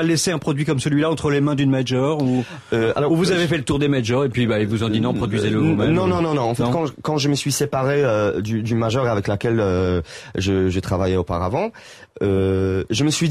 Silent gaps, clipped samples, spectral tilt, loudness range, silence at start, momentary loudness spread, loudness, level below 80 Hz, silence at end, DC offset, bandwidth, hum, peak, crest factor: none; under 0.1%; -6 dB/octave; 2 LU; 0 s; 4 LU; -20 LUFS; -40 dBFS; 0 s; under 0.1%; 15 kHz; none; -8 dBFS; 10 dB